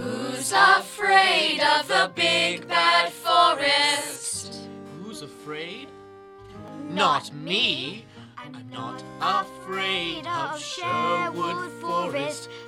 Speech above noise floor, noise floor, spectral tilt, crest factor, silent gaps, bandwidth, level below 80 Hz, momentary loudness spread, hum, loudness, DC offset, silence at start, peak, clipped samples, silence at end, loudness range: 21 dB; -45 dBFS; -2 dB/octave; 22 dB; none; 16 kHz; -66 dBFS; 20 LU; none; -22 LUFS; under 0.1%; 0 s; -4 dBFS; under 0.1%; 0 s; 10 LU